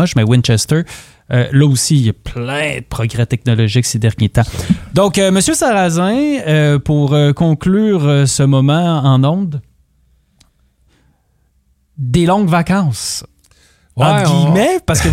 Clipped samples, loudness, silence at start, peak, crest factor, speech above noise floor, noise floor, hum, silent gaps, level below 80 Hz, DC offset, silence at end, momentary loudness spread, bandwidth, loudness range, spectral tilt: under 0.1%; -13 LUFS; 0 s; 0 dBFS; 12 dB; 45 dB; -58 dBFS; none; none; -36 dBFS; under 0.1%; 0 s; 8 LU; 15.5 kHz; 6 LU; -5.5 dB/octave